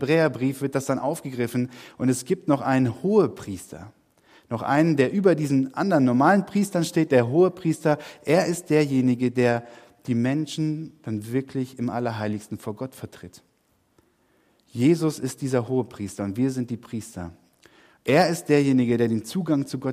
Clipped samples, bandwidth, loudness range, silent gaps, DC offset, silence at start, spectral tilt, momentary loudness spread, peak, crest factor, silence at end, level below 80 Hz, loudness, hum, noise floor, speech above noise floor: under 0.1%; 15.5 kHz; 8 LU; none; under 0.1%; 0 s; -6.5 dB/octave; 14 LU; -6 dBFS; 18 dB; 0 s; -66 dBFS; -23 LUFS; none; -67 dBFS; 44 dB